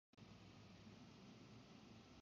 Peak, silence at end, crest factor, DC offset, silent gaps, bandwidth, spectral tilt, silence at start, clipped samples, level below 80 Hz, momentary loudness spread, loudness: -50 dBFS; 0 s; 12 dB; under 0.1%; none; 7.2 kHz; -5 dB/octave; 0.15 s; under 0.1%; -78 dBFS; 1 LU; -63 LUFS